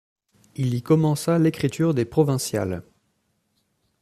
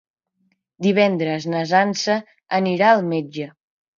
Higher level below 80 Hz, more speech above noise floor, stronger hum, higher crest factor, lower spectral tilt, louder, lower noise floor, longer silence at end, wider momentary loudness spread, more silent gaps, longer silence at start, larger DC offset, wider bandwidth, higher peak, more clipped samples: first, -58 dBFS vs -70 dBFS; about the same, 49 dB vs 49 dB; neither; about the same, 18 dB vs 18 dB; about the same, -6.5 dB/octave vs -5.5 dB/octave; second, -22 LUFS vs -19 LUFS; about the same, -71 dBFS vs -68 dBFS; first, 1.2 s vs 0.5 s; about the same, 9 LU vs 10 LU; neither; second, 0.6 s vs 0.8 s; neither; first, 14.5 kHz vs 7.4 kHz; second, -6 dBFS vs -2 dBFS; neither